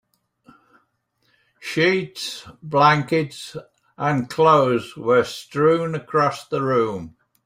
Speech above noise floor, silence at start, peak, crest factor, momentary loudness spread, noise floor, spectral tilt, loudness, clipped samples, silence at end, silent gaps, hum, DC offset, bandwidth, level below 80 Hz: 48 dB; 1.6 s; -2 dBFS; 18 dB; 18 LU; -68 dBFS; -5.5 dB/octave; -20 LUFS; under 0.1%; 0.35 s; none; none; under 0.1%; 15.5 kHz; -60 dBFS